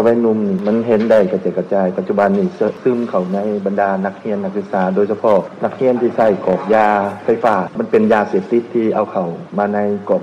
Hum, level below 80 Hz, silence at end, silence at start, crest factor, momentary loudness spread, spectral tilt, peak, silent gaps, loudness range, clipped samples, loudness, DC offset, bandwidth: none; -58 dBFS; 0 s; 0 s; 12 dB; 7 LU; -8.5 dB/octave; -4 dBFS; none; 2 LU; under 0.1%; -16 LUFS; under 0.1%; 8.8 kHz